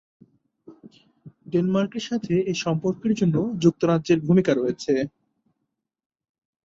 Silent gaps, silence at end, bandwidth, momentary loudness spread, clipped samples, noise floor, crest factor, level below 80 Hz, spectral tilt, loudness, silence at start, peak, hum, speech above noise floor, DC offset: none; 1.55 s; 7.8 kHz; 6 LU; under 0.1%; -80 dBFS; 20 dB; -60 dBFS; -7 dB/octave; -23 LUFS; 0.7 s; -6 dBFS; none; 58 dB; under 0.1%